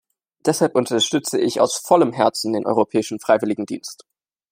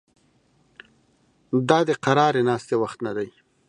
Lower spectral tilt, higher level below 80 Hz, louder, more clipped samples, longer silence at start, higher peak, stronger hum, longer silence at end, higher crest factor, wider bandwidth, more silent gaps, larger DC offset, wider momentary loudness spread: second, -4 dB/octave vs -6 dB/octave; about the same, -68 dBFS vs -68 dBFS; first, -19 LUFS vs -22 LUFS; neither; second, 0.45 s vs 1.5 s; about the same, -2 dBFS vs -2 dBFS; neither; first, 0.6 s vs 0.4 s; about the same, 18 dB vs 22 dB; first, 16 kHz vs 10.5 kHz; neither; neither; about the same, 8 LU vs 10 LU